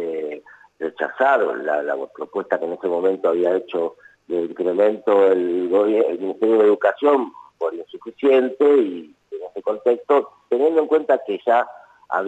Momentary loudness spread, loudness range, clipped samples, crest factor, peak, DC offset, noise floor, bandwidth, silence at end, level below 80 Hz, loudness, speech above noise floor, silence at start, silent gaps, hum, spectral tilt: 13 LU; 4 LU; under 0.1%; 14 dB; -6 dBFS; under 0.1%; -38 dBFS; 8 kHz; 0 s; -76 dBFS; -20 LUFS; 19 dB; 0 s; none; none; -6.5 dB/octave